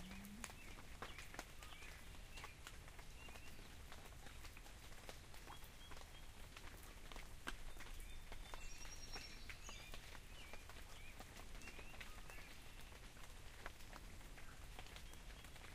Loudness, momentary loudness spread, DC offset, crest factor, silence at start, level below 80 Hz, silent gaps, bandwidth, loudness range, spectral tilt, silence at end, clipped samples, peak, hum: -57 LUFS; 5 LU; under 0.1%; 26 dB; 0 s; -58 dBFS; none; 15.5 kHz; 3 LU; -3 dB/octave; 0 s; under 0.1%; -28 dBFS; none